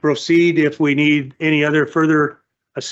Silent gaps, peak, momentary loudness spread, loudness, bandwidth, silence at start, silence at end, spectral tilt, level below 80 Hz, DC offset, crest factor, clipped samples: none; -6 dBFS; 7 LU; -16 LUFS; 8 kHz; 0.05 s; 0 s; -6 dB/octave; -64 dBFS; under 0.1%; 10 dB; under 0.1%